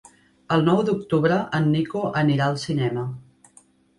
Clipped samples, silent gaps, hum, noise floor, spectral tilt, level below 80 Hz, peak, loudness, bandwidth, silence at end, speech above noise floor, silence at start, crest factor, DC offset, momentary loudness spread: under 0.1%; none; none; -56 dBFS; -7 dB/octave; -58 dBFS; -6 dBFS; -22 LUFS; 11.5 kHz; 0.8 s; 35 dB; 0.5 s; 16 dB; under 0.1%; 7 LU